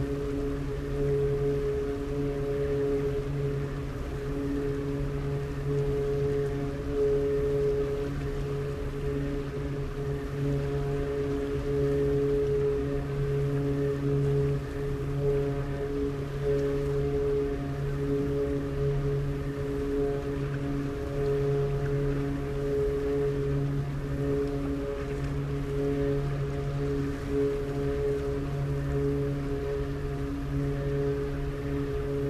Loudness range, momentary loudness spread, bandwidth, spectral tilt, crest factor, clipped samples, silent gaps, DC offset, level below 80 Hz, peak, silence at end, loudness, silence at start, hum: 2 LU; 5 LU; 13.5 kHz; -8.5 dB/octave; 12 dB; under 0.1%; none; under 0.1%; -38 dBFS; -16 dBFS; 0 s; -30 LUFS; 0 s; none